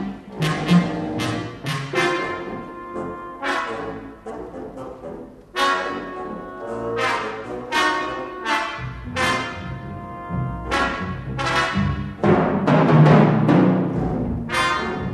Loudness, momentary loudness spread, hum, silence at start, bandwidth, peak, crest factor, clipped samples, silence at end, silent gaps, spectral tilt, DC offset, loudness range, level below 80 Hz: -21 LUFS; 17 LU; none; 0 s; 12.5 kHz; -4 dBFS; 18 dB; under 0.1%; 0 s; none; -6 dB/octave; under 0.1%; 10 LU; -42 dBFS